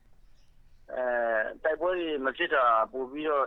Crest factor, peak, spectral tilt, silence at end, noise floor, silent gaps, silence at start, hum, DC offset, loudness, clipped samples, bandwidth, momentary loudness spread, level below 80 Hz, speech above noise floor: 16 dB; -14 dBFS; -5.5 dB/octave; 0 s; -55 dBFS; none; 0.9 s; none; under 0.1%; -28 LUFS; under 0.1%; 5.6 kHz; 9 LU; -60 dBFS; 27 dB